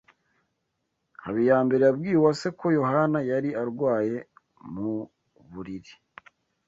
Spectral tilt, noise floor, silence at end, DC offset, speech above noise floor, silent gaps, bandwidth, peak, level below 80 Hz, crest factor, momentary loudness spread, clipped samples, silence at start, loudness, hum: -7.5 dB/octave; -78 dBFS; 0.75 s; under 0.1%; 54 dB; none; 8 kHz; -8 dBFS; -64 dBFS; 18 dB; 19 LU; under 0.1%; 1.2 s; -25 LUFS; none